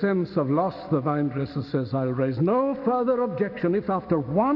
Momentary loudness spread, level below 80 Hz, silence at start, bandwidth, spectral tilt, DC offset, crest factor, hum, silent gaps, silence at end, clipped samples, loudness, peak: 4 LU; -58 dBFS; 0 s; 5.8 kHz; -11 dB/octave; under 0.1%; 14 dB; none; none; 0 s; under 0.1%; -25 LUFS; -10 dBFS